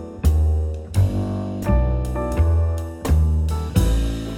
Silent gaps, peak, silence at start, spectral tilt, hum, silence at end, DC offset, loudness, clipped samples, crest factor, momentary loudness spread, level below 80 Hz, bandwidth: none; -4 dBFS; 0 s; -7.5 dB/octave; none; 0 s; under 0.1%; -21 LUFS; under 0.1%; 16 dB; 5 LU; -22 dBFS; 15.5 kHz